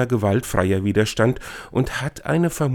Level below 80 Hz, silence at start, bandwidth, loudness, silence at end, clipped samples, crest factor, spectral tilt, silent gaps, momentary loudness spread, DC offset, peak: -42 dBFS; 0 s; 19 kHz; -21 LUFS; 0 s; under 0.1%; 18 dB; -6 dB/octave; none; 6 LU; under 0.1%; -2 dBFS